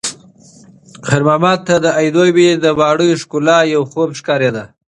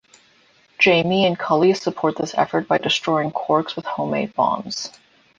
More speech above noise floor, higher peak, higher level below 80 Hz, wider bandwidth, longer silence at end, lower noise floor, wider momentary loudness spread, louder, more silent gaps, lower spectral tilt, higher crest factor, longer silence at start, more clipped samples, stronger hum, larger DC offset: second, 30 dB vs 36 dB; about the same, 0 dBFS vs -2 dBFS; first, -52 dBFS vs -62 dBFS; first, 11.5 kHz vs 9.4 kHz; second, 0.3 s vs 0.5 s; second, -43 dBFS vs -56 dBFS; about the same, 8 LU vs 10 LU; first, -13 LUFS vs -20 LUFS; neither; about the same, -5 dB/octave vs -5 dB/octave; about the same, 14 dB vs 18 dB; second, 0.05 s vs 0.8 s; neither; neither; neither